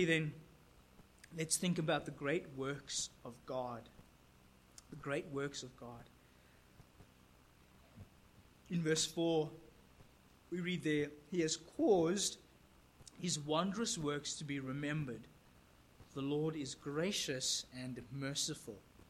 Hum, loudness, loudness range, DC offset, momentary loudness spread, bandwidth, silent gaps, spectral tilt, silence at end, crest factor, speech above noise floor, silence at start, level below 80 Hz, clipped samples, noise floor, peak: none; -39 LUFS; 11 LU; under 0.1%; 19 LU; 16 kHz; none; -4 dB/octave; 0.3 s; 20 dB; 27 dB; 0 s; -68 dBFS; under 0.1%; -66 dBFS; -20 dBFS